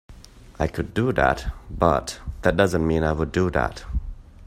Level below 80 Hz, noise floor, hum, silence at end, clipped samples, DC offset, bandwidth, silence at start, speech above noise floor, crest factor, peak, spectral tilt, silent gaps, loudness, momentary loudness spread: -34 dBFS; -45 dBFS; none; 0 s; under 0.1%; under 0.1%; 16 kHz; 0.1 s; 23 dB; 20 dB; -2 dBFS; -6.5 dB/octave; none; -23 LUFS; 12 LU